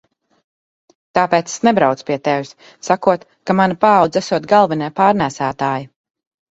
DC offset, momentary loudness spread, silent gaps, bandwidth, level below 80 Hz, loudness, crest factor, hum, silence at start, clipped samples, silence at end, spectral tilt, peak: under 0.1%; 8 LU; none; 8.2 kHz; -58 dBFS; -16 LUFS; 16 dB; none; 1.15 s; under 0.1%; 0.65 s; -5.5 dB/octave; 0 dBFS